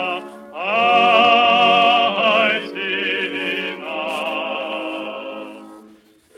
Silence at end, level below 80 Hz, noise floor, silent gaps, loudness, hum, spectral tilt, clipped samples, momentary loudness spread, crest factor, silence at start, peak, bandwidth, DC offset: 0.5 s; -68 dBFS; -50 dBFS; none; -17 LUFS; none; -4 dB/octave; under 0.1%; 16 LU; 18 dB; 0 s; -2 dBFS; 12 kHz; under 0.1%